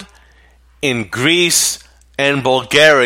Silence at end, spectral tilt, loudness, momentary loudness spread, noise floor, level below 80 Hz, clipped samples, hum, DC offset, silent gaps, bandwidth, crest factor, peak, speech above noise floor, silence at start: 0 s; -2.5 dB/octave; -13 LUFS; 11 LU; -48 dBFS; -50 dBFS; under 0.1%; none; under 0.1%; none; 16.5 kHz; 16 dB; 0 dBFS; 35 dB; 0 s